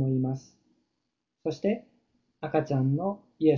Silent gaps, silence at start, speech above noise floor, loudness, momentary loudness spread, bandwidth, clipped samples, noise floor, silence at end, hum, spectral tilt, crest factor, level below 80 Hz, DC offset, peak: none; 0 s; 55 dB; -30 LUFS; 10 LU; 7 kHz; under 0.1%; -81 dBFS; 0 s; none; -9 dB/octave; 20 dB; -66 dBFS; under 0.1%; -10 dBFS